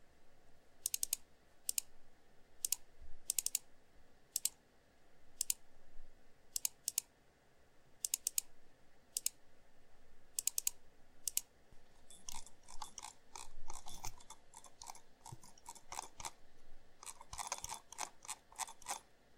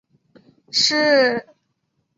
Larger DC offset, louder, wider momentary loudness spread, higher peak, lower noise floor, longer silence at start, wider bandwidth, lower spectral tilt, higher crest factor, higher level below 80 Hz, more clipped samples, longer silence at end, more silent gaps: neither; second, -42 LUFS vs -17 LUFS; first, 17 LU vs 9 LU; second, -14 dBFS vs -4 dBFS; about the same, -69 dBFS vs -71 dBFS; second, 0 s vs 0.75 s; first, 16.5 kHz vs 8 kHz; second, 1 dB/octave vs -1.5 dB/octave; first, 32 dB vs 18 dB; first, -60 dBFS vs -68 dBFS; neither; second, 0 s vs 0.75 s; neither